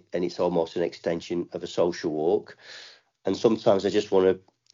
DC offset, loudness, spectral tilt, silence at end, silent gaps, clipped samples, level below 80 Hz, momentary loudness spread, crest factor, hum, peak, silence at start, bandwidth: under 0.1%; -26 LUFS; -5 dB/octave; 0.35 s; none; under 0.1%; -68 dBFS; 12 LU; 20 dB; none; -6 dBFS; 0.15 s; 7.4 kHz